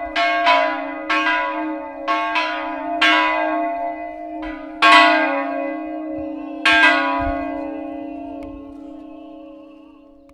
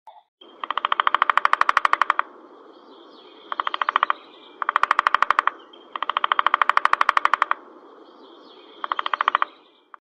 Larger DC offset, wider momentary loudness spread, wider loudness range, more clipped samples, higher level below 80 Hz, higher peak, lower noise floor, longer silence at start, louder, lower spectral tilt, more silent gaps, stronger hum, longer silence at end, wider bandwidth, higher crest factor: neither; first, 21 LU vs 10 LU; about the same, 4 LU vs 4 LU; neither; first, -46 dBFS vs -70 dBFS; about the same, 0 dBFS vs 0 dBFS; second, -45 dBFS vs -50 dBFS; about the same, 0 s vs 0.05 s; first, -17 LUFS vs -21 LUFS; first, -3 dB/octave vs -0.5 dB/octave; second, none vs 0.28-0.38 s; neither; about the same, 0.6 s vs 0.55 s; about the same, 12 kHz vs 11 kHz; about the same, 20 dB vs 24 dB